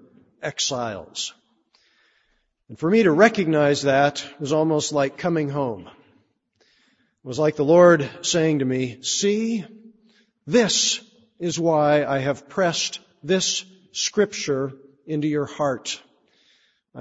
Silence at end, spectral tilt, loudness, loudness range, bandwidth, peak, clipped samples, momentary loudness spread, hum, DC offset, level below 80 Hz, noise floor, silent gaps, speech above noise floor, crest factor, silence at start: 0 s; -4 dB/octave; -21 LUFS; 5 LU; 8 kHz; -2 dBFS; under 0.1%; 13 LU; none; under 0.1%; -64 dBFS; -68 dBFS; none; 47 dB; 20 dB; 0.4 s